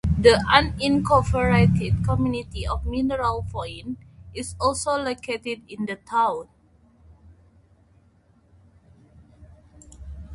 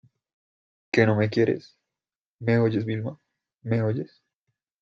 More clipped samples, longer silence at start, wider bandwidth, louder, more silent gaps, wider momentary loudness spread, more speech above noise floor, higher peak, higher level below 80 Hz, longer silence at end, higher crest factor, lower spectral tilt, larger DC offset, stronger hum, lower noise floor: neither; second, 0.05 s vs 0.95 s; first, 11.5 kHz vs 7.4 kHz; about the same, -23 LUFS vs -25 LUFS; second, none vs 2.15-2.39 s; first, 17 LU vs 12 LU; second, 37 dB vs over 67 dB; about the same, -2 dBFS vs -4 dBFS; first, -36 dBFS vs -64 dBFS; second, 0 s vs 0.75 s; about the same, 22 dB vs 22 dB; second, -5.5 dB/octave vs -8 dB/octave; neither; neither; second, -59 dBFS vs under -90 dBFS